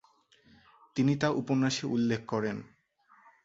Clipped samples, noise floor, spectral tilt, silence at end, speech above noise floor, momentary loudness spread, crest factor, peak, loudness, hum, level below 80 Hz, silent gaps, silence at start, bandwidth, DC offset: under 0.1%; -64 dBFS; -6 dB/octave; 0.8 s; 35 dB; 9 LU; 20 dB; -12 dBFS; -30 LUFS; none; -68 dBFS; none; 0.95 s; 7.8 kHz; under 0.1%